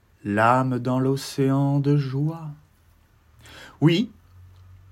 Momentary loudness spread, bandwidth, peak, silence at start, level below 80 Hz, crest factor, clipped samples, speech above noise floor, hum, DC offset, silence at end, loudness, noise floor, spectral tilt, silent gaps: 16 LU; 15 kHz; -4 dBFS; 0.25 s; -62 dBFS; 20 dB; under 0.1%; 36 dB; none; under 0.1%; 0.85 s; -22 LUFS; -58 dBFS; -7 dB/octave; none